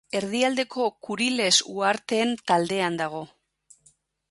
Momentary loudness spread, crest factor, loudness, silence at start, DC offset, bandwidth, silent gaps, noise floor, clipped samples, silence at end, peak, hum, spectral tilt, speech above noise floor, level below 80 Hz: 10 LU; 20 dB; -24 LUFS; 0.15 s; under 0.1%; 11.5 kHz; none; -63 dBFS; under 0.1%; 1.05 s; -6 dBFS; none; -2.5 dB/octave; 38 dB; -70 dBFS